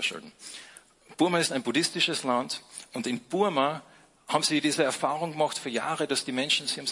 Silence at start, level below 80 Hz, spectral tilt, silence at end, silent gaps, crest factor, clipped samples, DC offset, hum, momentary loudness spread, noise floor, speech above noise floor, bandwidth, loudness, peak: 0 s; -76 dBFS; -3 dB/octave; 0 s; none; 20 dB; under 0.1%; under 0.1%; none; 15 LU; -53 dBFS; 25 dB; 11.5 kHz; -27 LUFS; -8 dBFS